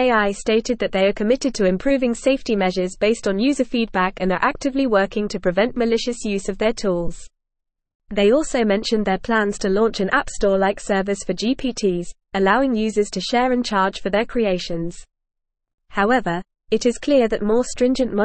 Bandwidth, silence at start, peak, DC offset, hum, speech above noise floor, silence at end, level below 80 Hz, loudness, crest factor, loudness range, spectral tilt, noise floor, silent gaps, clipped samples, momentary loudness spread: 8.8 kHz; 0 s; -2 dBFS; 0.5%; none; 60 dB; 0 s; -40 dBFS; -20 LUFS; 16 dB; 3 LU; -5 dB/octave; -80 dBFS; 7.95-8.00 s, 15.74-15.78 s; under 0.1%; 5 LU